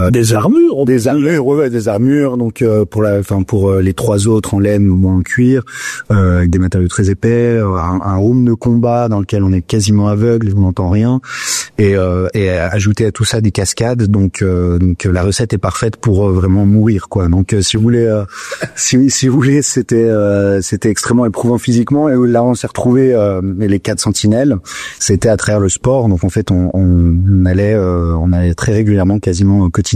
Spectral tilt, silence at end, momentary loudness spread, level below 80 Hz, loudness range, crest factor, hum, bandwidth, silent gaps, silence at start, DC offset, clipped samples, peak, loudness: -6 dB/octave; 0 s; 4 LU; -36 dBFS; 1 LU; 10 dB; none; 14 kHz; none; 0 s; under 0.1%; under 0.1%; -2 dBFS; -12 LUFS